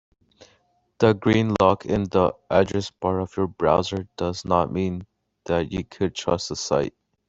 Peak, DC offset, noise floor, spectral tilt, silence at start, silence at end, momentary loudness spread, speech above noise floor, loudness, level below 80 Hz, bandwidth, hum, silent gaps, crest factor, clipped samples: -2 dBFS; under 0.1%; -64 dBFS; -6 dB/octave; 1 s; 0.4 s; 9 LU; 42 dB; -23 LUFS; -50 dBFS; 8 kHz; none; none; 20 dB; under 0.1%